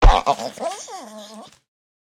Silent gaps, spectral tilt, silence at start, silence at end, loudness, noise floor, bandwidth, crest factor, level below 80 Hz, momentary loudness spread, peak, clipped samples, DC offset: none; -4.5 dB/octave; 0 s; 0.7 s; -23 LUFS; -41 dBFS; 10.5 kHz; 18 dB; -22 dBFS; 21 LU; -2 dBFS; under 0.1%; under 0.1%